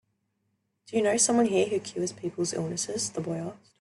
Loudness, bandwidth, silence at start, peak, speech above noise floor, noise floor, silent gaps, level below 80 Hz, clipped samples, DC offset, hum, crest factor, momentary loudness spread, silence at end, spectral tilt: -28 LUFS; 12.5 kHz; 0.9 s; -8 dBFS; 49 dB; -77 dBFS; none; -70 dBFS; under 0.1%; under 0.1%; none; 20 dB; 11 LU; 0.25 s; -3.5 dB/octave